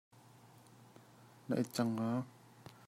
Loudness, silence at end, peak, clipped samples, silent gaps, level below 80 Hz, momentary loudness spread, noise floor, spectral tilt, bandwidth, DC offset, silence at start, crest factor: -38 LUFS; 0.15 s; -22 dBFS; under 0.1%; none; -82 dBFS; 25 LU; -61 dBFS; -6.5 dB/octave; 16 kHz; under 0.1%; 0.45 s; 20 dB